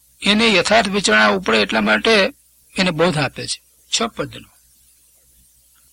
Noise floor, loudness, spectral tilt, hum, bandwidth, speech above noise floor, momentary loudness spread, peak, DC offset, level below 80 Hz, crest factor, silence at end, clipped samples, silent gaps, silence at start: -54 dBFS; -16 LUFS; -3.5 dB/octave; 60 Hz at -45 dBFS; 16.5 kHz; 37 dB; 13 LU; 0 dBFS; under 0.1%; -48 dBFS; 18 dB; 1.55 s; under 0.1%; none; 0.2 s